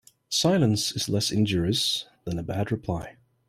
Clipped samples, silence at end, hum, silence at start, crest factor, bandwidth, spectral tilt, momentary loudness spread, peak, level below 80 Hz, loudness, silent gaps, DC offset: under 0.1%; 0.35 s; none; 0.3 s; 16 dB; 16 kHz; -4.5 dB/octave; 11 LU; -10 dBFS; -52 dBFS; -26 LUFS; none; under 0.1%